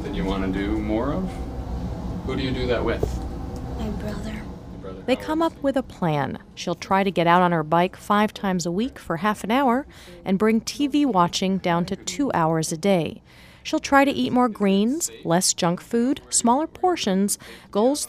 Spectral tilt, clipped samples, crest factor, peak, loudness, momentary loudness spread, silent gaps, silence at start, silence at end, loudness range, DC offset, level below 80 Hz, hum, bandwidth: -4.5 dB/octave; under 0.1%; 20 dB; -2 dBFS; -23 LUFS; 12 LU; none; 0 s; 0 s; 6 LU; under 0.1%; -38 dBFS; none; 15.5 kHz